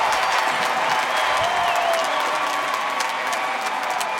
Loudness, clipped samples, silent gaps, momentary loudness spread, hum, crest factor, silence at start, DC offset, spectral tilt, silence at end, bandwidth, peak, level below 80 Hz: -21 LUFS; under 0.1%; none; 4 LU; none; 16 dB; 0 s; under 0.1%; -1 dB/octave; 0 s; 17 kHz; -6 dBFS; -60 dBFS